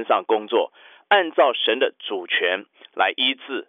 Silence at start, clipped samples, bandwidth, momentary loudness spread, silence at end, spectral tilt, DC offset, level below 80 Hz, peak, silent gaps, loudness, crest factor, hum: 0 s; under 0.1%; 5 kHz; 10 LU; 0.05 s; -4.5 dB/octave; under 0.1%; -80 dBFS; -6 dBFS; none; -21 LUFS; 16 dB; none